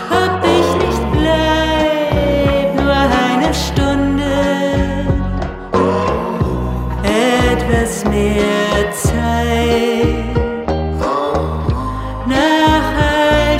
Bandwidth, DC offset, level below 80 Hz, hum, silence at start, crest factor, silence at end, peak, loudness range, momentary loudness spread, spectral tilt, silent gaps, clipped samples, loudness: 16 kHz; under 0.1%; -24 dBFS; none; 0 s; 14 dB; 0 s; 0 dBFS; 2 LU; 6 LU; -5.5 dB/octave; none; under 0.1%; -15 LUFS